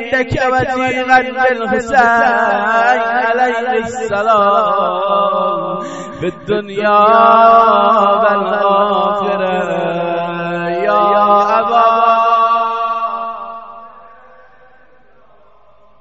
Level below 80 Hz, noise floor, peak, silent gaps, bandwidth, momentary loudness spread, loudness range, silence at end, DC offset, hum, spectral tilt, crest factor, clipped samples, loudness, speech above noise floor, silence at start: -46 dBFS; -49 dBFS; 0 dBFS; none; 8 kHz; 10 LU; 5 LU; 2 s; 0.5%; none; -5.5 dB/octave; 14 dB; under 0.1%; -12 LUFS; 37 dB; 0 s